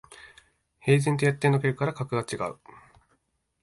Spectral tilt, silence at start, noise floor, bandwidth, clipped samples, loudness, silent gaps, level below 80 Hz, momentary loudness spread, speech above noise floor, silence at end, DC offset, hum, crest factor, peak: -6.5 dB/octave; 0.25 s; -73 dBFS; 11.5 kHz; under 0.1%; -26 LUFS; none; -62 dBFS; 10 LU; 48 dB; 1.1 s; under 0.1%; none; 20 dB; -8 dBFS